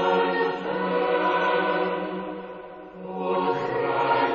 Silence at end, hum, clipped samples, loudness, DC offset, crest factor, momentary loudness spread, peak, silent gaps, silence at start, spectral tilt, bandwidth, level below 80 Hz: 0 s; none; under 0.1%; -25 LUFS; under 0.1%; 14 dB; 15 LU; -10 dBFS; none; 0 s; -3 dB/octave; 7 kHz; -62 dBFS